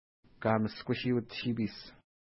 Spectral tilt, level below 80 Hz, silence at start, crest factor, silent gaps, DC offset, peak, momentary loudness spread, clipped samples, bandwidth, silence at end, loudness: -10 dB/octave; -64 dBFS; 0.4 s; 20 dB; none; under 0.1%; -14 dBFS; 10 LU; under 0.1%; 5.8 kHz; 0.3 s; -34 LUFS